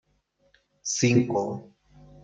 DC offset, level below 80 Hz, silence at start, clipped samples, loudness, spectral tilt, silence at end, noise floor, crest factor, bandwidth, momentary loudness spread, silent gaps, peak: under 0.1%; -62 dBFS; 0.85 s; under 0.1%; -25 LUFS; -5 dB/octave; 0.6 s; -69 dBFS; 20 dB; 9.4 kHz; 14 LU; none; -8 dBFS